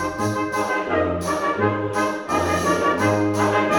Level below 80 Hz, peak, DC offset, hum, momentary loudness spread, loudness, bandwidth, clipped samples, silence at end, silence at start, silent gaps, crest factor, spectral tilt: -48 dBFS; -6 dBFS; under 0.1%; none; 4 LU; -21 LUFS; 19 kHz; under 0.1%; 0 s; 0 s; none; 14 dB; -5.5 dB/octave